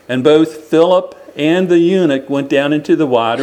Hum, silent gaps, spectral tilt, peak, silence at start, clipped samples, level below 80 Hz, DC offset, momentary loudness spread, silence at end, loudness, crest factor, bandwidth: none; none; -6.5 dB/octave; 0 dBFS; 0.1 s; under 0.1%; -62 dBFS; under 0.1%; 5 LU; 0 s; -13 LUFS; 12 dB; 9.4 kHz